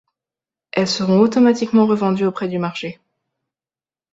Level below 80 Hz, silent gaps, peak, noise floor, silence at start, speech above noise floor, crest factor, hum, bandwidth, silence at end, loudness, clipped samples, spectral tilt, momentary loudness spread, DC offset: -62 dBFS; none; -2 dBFS; under -90 dBFS; 0.75 s; over 74 dB; 16 dB; none; 7.8 kHz; 1.2 s; -17 LUFS; under 0.1%; -6 dB/octave; 11 LU; under 0.1%